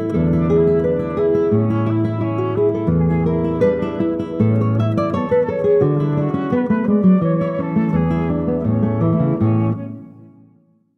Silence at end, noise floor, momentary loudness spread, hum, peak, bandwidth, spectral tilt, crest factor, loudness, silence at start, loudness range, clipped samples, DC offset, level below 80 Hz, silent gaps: 0.8 s; -55 dBFS; 5 LU; none; -2 dBFS; 6 kHz; -11 dB/octave; 14 dB; -18 LUFS; 0 s; 1 LU; under 0.1%; under 0.1%; -40 dBFS; none